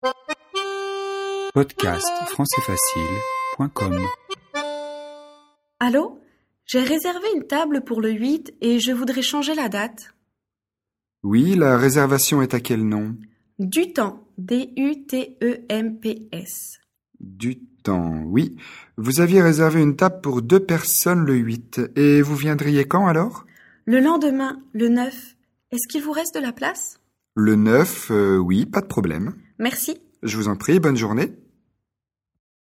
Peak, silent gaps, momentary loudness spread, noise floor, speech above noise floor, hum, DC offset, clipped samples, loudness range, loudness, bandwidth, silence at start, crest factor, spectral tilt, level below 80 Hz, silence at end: 0 dBFS; none; 14 LU; -88 dBFS; 68 dB; none; under 0.1%; under 0.1%; 8 LU; -21 LUFS; 17 kHz; 0.05 s; 20 dB; -5 dB/octave; -54 dBFS; 1.35 s